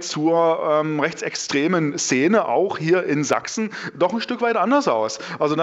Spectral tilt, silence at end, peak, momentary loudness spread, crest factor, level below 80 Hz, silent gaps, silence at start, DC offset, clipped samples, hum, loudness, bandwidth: -4.5 dB/octave; 0 s; -2 dBFS; 6 LU; 20 dB; -70 dBFS; none; 0 s; under 0.1%; under 0.1%; none; -20 LUFS; 8.2 kHz